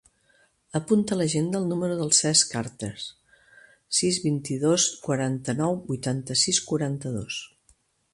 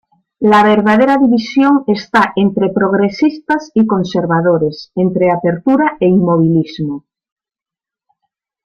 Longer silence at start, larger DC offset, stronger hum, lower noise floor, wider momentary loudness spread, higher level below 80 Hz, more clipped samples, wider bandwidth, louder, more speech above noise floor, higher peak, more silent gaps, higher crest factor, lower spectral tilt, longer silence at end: first, 0.75 s vs 0.4 s; neither; neither; second, -64 dBFS vs -89 dBFS; first, 13 LU vs 7 LU; second, -62 dBFS vs -52 dBFS; neither; first, 11.5 kHz vs 8.2 kHz; second, -25 LUFS vs -13 LUFS; second, 39 dB vs 77 dB; second, -4 dBFS vs 0 dBFS; neither; first, 22 dB vs 12 dB; second, -3.5 dB/octave vs -7.5 dB/octave; second, 0.65 s vs 1.65 s